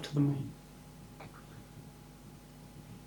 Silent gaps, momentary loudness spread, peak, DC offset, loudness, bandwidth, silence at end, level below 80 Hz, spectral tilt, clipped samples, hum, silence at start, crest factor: none; 21 LU; -20 dBFS; under 0.1%; -37 LUFS; over 20 kHz; 0 s; -60 dBFS; -7 dB/octave; under 0.1%; none; 0 s; 20 dB